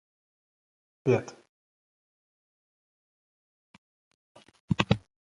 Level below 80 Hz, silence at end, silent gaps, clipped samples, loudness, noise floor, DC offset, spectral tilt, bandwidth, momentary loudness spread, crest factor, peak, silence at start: -56 dBFS; 0.35 s; 1.49-4.35 s, 4.60-4.68 s; under 0.1%; -29 LUFS; under -90 dBFS; under 0.1%; -6.5 dB/octave; 10.5 kHz; 6 LU; 34 dB; -2 dBFS; 1.05 s